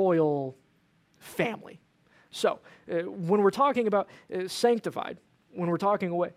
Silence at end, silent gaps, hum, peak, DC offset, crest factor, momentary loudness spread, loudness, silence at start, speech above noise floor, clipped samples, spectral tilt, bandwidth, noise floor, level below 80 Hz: 0.05 s; none; none; -12 dBFS; under 0.1%; 18 dB; 16 LU; -28 LUFS; 0 s; 39 dB; under 0.1%; -6 dB/octave; 16 kHz; -67 dBFS; -74 dBFS